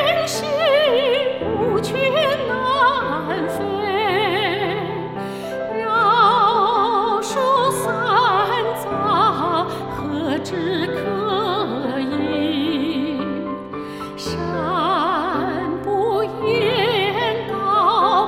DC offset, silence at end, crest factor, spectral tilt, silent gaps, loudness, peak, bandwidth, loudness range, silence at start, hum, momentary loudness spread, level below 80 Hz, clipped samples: 0.1%; 0 s; 16 dB; -4.5 dB/octave; none; -19 LUFS; -4 dBFS; 16.5 kHz; 5 LU; 0 s; none; 9 LU; -52 dBFS; under 0.1%